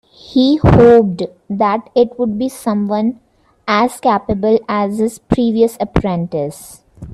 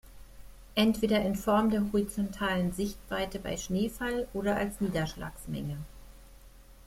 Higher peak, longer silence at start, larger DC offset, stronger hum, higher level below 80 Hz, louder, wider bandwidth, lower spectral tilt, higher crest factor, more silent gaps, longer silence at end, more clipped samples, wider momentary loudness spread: first, 0 dBFS vs -14 dBFS; first, 0.3 s vs 0.05 s; neither; neither; first, -32 dBFS vs -48 dBFS; first, -14 LUFS vs -31 LUFS; second, 13.5 kHz vs 16.5 kHz; first, -7 dB/octave vs -5.5 dB/octave; about the same, 14 dB vs 18 dB; neither; about the same, 0 s vs 0.1 s; neither; about the same, 12 LU vs 11 LU